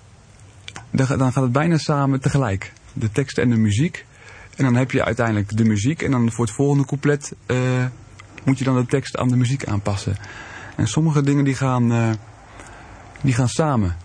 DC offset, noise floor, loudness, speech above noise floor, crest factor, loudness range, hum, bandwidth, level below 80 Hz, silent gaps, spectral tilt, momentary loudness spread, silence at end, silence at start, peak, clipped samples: under 0.1%; -46 dBFS; -20 LUFS; 27 dB; 18 dB; 2 LU; none; 10 kHz; -46 dBFS; none; -6.5 dB/octave; 15 LU; 0 s; 0.4 s; -2 dBFS; under 0.1%